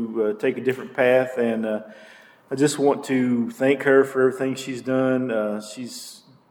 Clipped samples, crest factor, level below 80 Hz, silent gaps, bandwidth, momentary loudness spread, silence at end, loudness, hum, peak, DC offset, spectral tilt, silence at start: under 0.1%; 18 dB; -74 dBFS; none; 17.5 kHz; 14 LU; 0.35 s; -22 LUFS; none; -4 dBFS; under 0.1%; -5.5 dB/octave; 0 s